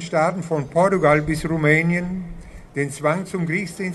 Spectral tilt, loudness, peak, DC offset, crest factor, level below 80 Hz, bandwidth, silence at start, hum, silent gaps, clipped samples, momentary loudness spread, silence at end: -6.5 dB/octave; -20 LUFS; -2 dBFS; under 0.1%; 18 dB; -42 dBFS; 12.5 kHz; 0 s; none; none; under 0.1%; 11 LU; 0 s